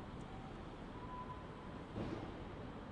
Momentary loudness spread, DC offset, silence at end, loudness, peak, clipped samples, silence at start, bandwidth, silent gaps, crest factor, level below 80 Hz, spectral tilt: 5 LU; under 0.1%; 0 s; -49 LUFS; -32 dBFS; under 0.1%; 0 s; 10.5 kHz; none; 16 dB; -58 dBFS; -7 dB/octave